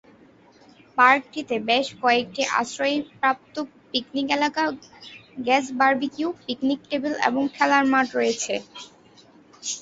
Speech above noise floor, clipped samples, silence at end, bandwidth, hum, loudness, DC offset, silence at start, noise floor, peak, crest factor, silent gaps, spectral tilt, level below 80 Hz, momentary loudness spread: 30 dB; under 0.1%; 0 s; 8 kHz; none; -23 LUFS; under 0.1%; 0.95 s; -53 dBFS; -2 dBFS; 22 dB; none; -2.5 dB/octave; -68 dBFS; 14 LU